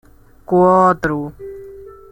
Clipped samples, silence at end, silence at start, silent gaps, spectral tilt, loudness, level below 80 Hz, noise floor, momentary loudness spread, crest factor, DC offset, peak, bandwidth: under 0.1%; 0.2 s; 0.5 s; none; -8.5 dB/octave; -14 LUFS; -44 dBFS; -37 dBFS; 23 LU; 16 dB; under 0.1%; -2 dBFS; 16.5 kHz